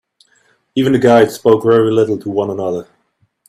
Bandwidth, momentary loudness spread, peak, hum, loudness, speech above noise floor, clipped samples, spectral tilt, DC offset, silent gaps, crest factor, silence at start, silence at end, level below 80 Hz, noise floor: 15 kHz; 11 LU; 0 dBFS; none; -13 LUFS; 49 dB; under 0.1%; -6.5 dB/octave; under 0.1%; none; 14 dB; 0.75 s; 0.65 s; -56 dBFS; -61 dBFS